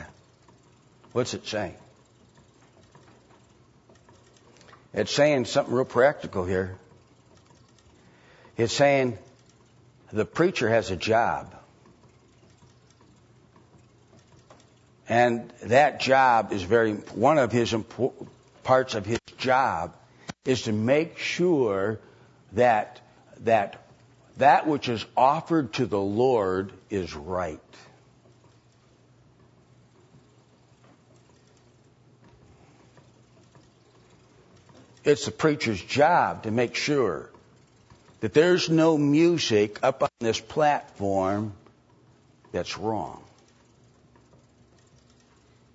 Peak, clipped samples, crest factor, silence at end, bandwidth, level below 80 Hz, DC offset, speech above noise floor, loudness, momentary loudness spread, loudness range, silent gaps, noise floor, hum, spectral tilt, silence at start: -6 dBFS; under 0.1%; 20 dB; 2.55 s; 8 kHz; -62 dBFS; under 0.1%; 35 dB; -24 LUFS; 14 LU; 13 LU; none; -59 dBFS; none; -5 dB/octave; 0 s